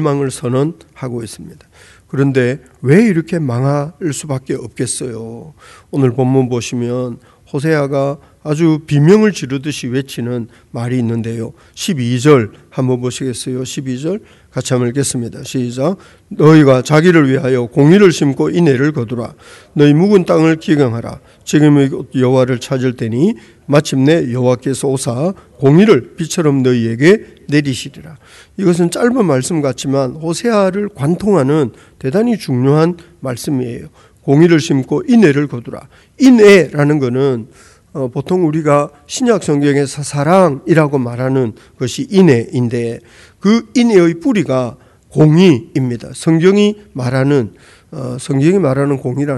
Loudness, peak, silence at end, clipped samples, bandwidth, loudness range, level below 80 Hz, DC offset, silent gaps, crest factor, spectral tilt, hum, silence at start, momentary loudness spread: -13 LUFS; 0 dBFS; 0 s; 0.5%; 12.5 kHz; 6 LU; -50 dBFS; under 0.1%; none; 14 dB; -6.5 dB/octave; none; 0 s; 14 LU